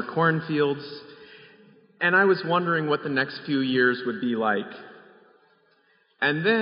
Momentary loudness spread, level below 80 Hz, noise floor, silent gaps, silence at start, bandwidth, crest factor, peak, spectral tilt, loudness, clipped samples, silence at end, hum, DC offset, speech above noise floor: 12 LU; -76 dBFS; -64 dBFS; none; 0 s; 5.4 kHz; 18 dB; -8 dBFS; -3.5 dB/octave; -24 LUFS; under 0.1%; 0 s; none; under 0.1%; 40 dB